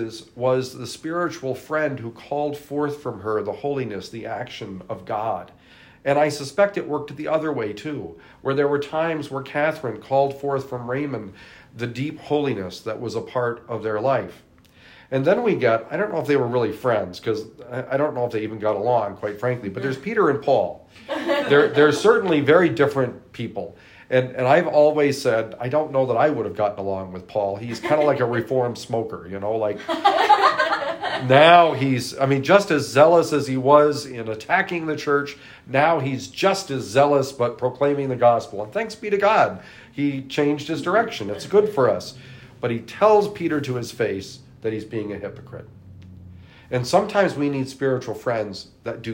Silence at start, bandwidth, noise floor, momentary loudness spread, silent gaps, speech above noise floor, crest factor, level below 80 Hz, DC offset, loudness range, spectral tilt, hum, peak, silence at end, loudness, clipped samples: 0 s; 16 kHz; -50 dBFS; 14 LU; none; 29 dB; 20 dB; -62 dBFS; under 0.1%; 9 LU; -5.5 dB/octave; none; 0 dBFS; 0 s; -21 LUFS; under 0.1%